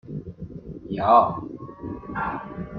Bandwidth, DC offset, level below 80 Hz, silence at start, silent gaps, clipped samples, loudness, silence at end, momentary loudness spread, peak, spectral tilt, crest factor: 5 kHz; under 0.1%; -50 dBFS; 0.05 s; none; under 0.1%; -23 LUFS; 0 s; 21 LU; -4 dBFS; -9.5 dB/octave; 22 dB